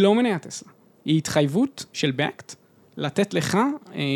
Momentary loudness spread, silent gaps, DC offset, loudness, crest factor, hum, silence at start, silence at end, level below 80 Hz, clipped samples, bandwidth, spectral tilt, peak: 16 LU; none; under 0.1%; -24 LUFS; 18 dB; none; 0 s; 0 s; -64 dBFS; under 0.1%; 18 kHz; -5.5 dB/octave; -4 dBFS